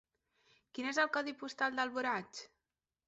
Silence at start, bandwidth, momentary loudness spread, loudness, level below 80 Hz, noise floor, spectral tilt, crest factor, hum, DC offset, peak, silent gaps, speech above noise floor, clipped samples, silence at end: 0.75 s; 8 kHz; 16 LU; -36 LUFS; -82 dBFS; under -90 dBFS; -0.5 dB/octave; 20 dB; none; under 0.1%; -18 dBFS; none; over 53 dB; under 0.1%; 0.6 s